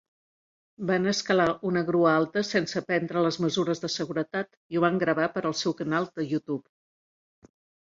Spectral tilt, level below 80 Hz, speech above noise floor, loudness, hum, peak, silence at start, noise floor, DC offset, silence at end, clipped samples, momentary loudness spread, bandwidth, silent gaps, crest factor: -5 dB/octave; -68 dBFS; over 64 dB; -27 LUFS; none; -8 dBFS; 0.8 s; under -90 dBFS; under 0.1%; 1.35 s; under 0.1%; 8 LU; 7.8 kHz; 4.57-4.70 s; 20 dB